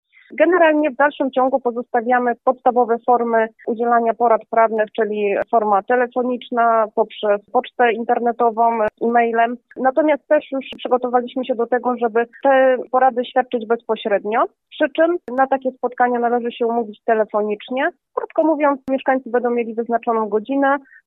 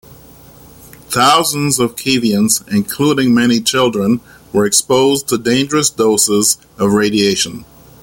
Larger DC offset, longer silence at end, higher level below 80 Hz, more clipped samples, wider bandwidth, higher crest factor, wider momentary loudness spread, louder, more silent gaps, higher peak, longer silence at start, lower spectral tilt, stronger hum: neither; second, 0.25 s vs 0.4 s; second, -68 dBFS vs -50 dBFS; neither; second, 4 kHz vs 17 kHz; about the same, 16 dB vs 14 dB; about the same, 6 LU vs 6 LU; second, -18 LUFS vs -13 LUFS; neither; about the same, -2 dBFS vs 0 dBFS; first, 0.3 s vs 0.1 s; first, -8 dB/octave vs -3.5 dB/octave; neither